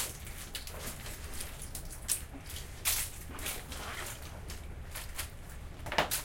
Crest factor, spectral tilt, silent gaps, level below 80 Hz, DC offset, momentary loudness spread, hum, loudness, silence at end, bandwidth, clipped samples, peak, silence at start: 28 dB; -2 dB/octave; none; -46 dBFS; under 0.1%; 13 LU; none; -38 LUFS; 0 s; 17 kHz; under 0.1%; -12 dBFS; 0 s